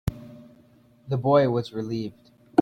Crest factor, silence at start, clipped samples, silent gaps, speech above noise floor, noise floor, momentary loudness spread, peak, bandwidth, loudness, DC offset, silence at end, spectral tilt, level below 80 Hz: 22 dB; 0.05 s; under 0.1%; none; 33 dB; -57 dBFS; 20 LU; -4 dBFS; 16 kHz; -25 LUFS; under 0.1%; 0 s; -8.5 dB/octave; -50 dBFS